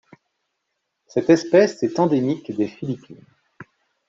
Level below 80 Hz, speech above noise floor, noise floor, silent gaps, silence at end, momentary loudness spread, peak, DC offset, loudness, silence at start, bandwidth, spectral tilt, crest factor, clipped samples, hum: -64 dBFS; 57 dB; -77 dBFS; none; 0.45 s; 14 LU; -4 dBFS; under 0.1%; -20 LUFS; 1.15 s; 7.8 kHz; -6.5 dB/octave; 20 dB; under 0.1%; none